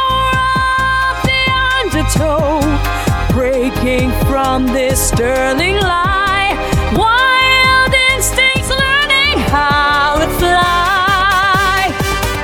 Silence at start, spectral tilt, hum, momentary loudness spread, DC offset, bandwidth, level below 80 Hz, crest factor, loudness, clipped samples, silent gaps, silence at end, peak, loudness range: 0 s; -3.5 dB/octave; none; 6 LU; under 0.1%; over 20 kHz; -24 dBFS; 12 dB; -12 LUFS; under 0.1%; none; 0 s; 0 dBFS; 4 LU